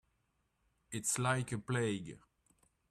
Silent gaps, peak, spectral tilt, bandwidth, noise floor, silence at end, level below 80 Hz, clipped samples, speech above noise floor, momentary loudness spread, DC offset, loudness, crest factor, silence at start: none; -18 dBFS; -4.5 dB/octave; 14 kHz; -80 dBFS; 0.75 s; -70 dBFS; under 0.1%; 43 dB; 11 LU; under 0.1%; -37 LUFS; 22 dB; 0.9 s